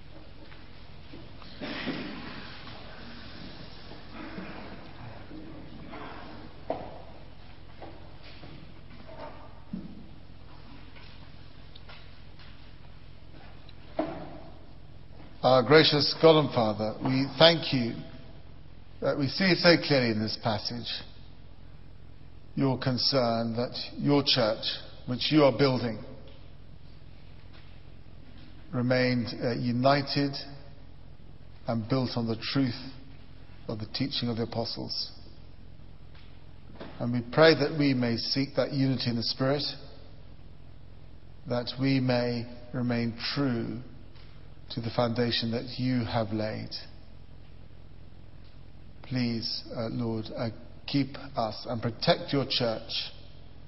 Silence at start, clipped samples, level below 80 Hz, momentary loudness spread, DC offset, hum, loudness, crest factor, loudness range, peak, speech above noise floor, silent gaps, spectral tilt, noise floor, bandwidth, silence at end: 0.05 s; under 0.1%; -54 dBFS; 26 LU; 0.6%; none; -28 LUFS; 26 dB; 19 LU; -4 dBFS; 23 dB; none; -8 dB/octave; -50 dBFS; 6 kHz; 0.2 s